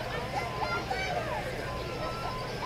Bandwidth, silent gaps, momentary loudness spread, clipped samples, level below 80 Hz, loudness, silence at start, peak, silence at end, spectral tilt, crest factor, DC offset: 16 kHz; none; 4 LU; under 0.1%; -46 dBFS; -33 LUFS; 0 s; -20 dBFS; 0 s; -5 dB/octave; 14 dB; under 0.1%